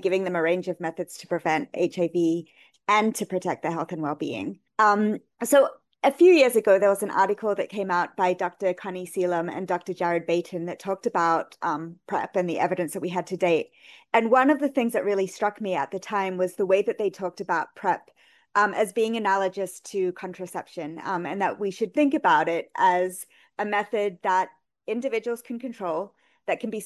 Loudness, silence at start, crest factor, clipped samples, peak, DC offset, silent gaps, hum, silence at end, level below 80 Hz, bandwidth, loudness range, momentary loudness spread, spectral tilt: -25 LUFS; 0 s; 18 dB; under 0.1%; -6 dBFS; under 0.1%; none; none; 0 s; -76 dBFS; 12.5 kHz; 6 LU; 12 LU; -5 dB/octave